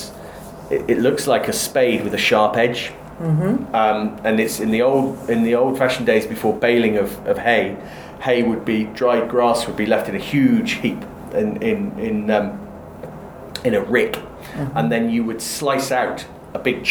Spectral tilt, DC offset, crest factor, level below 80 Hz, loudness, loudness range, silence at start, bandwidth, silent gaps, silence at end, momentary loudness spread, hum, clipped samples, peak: -5 dB/octave; under 0.1%; 18 dB; -48 dBFS; -19 LUFS; 4 LU; 0 s; over 20 kHz; none; 0 s; 15 LU; none; under 0.1%; -2 dBFS